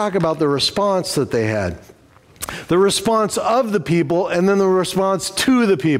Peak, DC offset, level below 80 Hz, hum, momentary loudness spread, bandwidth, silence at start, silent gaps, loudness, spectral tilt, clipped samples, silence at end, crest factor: -6 dBFS; under 0.1%; -48 dBFS; none; 7 LU; 16 kHz; 0 s; none; -17 LUFS; -5 dB/octave; under 0.1%; 0 s; 12 dB